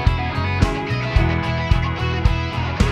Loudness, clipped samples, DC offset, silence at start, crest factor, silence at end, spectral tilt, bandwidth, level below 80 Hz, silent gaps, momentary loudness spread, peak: -20 LUFS; under 0.1%; under 0.1%; 0 s; 16 dB; 0 s; -6.5 dB/octave; 10.5 kHz; -24 dBFS; none; 3 LU; -2 dBFS